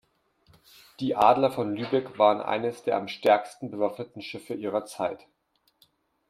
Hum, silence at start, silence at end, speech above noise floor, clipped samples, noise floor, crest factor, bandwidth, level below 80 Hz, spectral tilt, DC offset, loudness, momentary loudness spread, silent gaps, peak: none; 1 s; 1.15 s; 45 dB; under 0.1%; -71 dBFS; 22 dB; 16 kHz; -70 dBFS; -5.5 dB/octave; under 0.1%; -26 LUFS; 15 LU; none; -6 dBFS